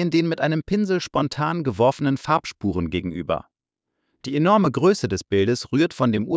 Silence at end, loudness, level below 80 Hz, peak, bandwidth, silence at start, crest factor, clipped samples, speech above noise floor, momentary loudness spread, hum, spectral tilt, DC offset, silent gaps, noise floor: 0 s; -22 LUFS; -46 dBFS; -6 dBFS; 8 kHz; 0 s; 16 dB; under 0.1%; 60 dB; 8 LU; none; -6.5 dB/octave; under 0.1%; none; -81 dBFS